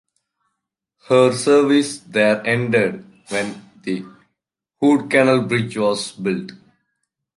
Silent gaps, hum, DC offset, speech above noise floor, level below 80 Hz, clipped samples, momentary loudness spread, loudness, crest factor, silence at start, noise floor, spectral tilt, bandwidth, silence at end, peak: none; none; under 0.1%; 61 dB; -64 dBFS; under 0.1%; 13 LU; -18 LUFS; 18 dB; 1.1 s; -79 dBFS; -5 dB/octave; 11.5 kHz; 0.8 s; -2 dBFS